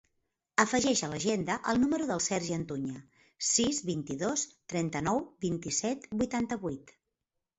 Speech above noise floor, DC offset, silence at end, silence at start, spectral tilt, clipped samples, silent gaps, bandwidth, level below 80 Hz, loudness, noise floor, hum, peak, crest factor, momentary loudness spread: 55 dB; under 0.1%; 0.7 s; 0.6 s; -3.5 dB/octave; under 0.1%; none; 8.2 kHz; -60 dBFS; -31 LUFS; -86 dBFS; none; -8 dBFS; 24 dB; 9 LU